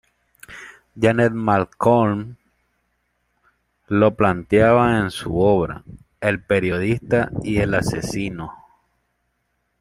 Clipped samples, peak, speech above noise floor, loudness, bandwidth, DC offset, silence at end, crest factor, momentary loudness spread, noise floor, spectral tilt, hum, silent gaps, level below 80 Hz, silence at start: under 0.1%; -2 dBFS; 52 dB; -19 LUFS; 15.5 kHz; under 0.1%; 1.3 s; 18 dB; 20 LU; -71 dBFS; -7 dB/octave; 60 Hz at -45 dBFS; none; -46 dBFS; 0.5 s